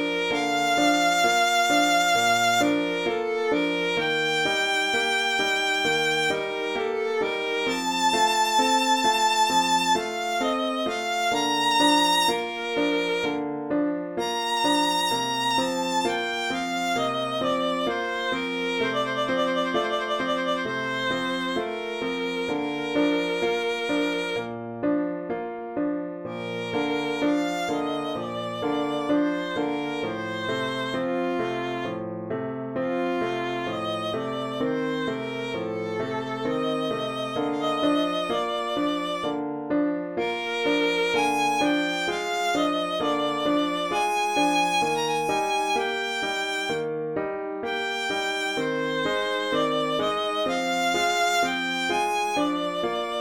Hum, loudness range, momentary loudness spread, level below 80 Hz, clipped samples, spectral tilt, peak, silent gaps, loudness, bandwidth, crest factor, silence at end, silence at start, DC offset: none; 6 LU; 8 LU; -64 dBFS; under 0.1%; -3 dB/octave; -10 dBFS; none; -25 LUFS; over 20 kHz; 16 dB; 0 s; 0 s; under 0.1%